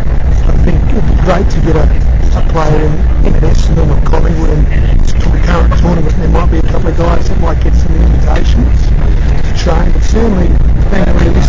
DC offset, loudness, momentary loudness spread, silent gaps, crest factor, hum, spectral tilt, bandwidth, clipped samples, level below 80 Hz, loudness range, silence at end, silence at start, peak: 5%; -11 LUFS; 2 LU; none; 4 dB; none; -7.5 dB/octave; 7.6 kHz; under 0.1%; -10 dBFS; 0 LU; 0 s; 0 s; -2 dBFS